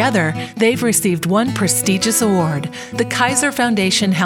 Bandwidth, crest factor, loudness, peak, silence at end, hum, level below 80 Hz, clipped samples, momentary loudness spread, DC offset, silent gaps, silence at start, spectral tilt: 17.5 kHz; 16 dB; -16 LUFS; 0 dBFS; 0 s; none; -52 dBFS; under 0.1%; 6 LU; under 0.1%; none; 0 s; -4 dB/octave